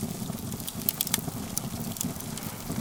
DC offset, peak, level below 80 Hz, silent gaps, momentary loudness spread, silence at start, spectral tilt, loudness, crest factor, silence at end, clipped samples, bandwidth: under 0.1%; 0 dBFS; -52 dBFS; none; 7 LU; 0 s; -3.5 dB/octave; -31 LUFS; 32 dB; 0 s; under 0.1%; 19 kHz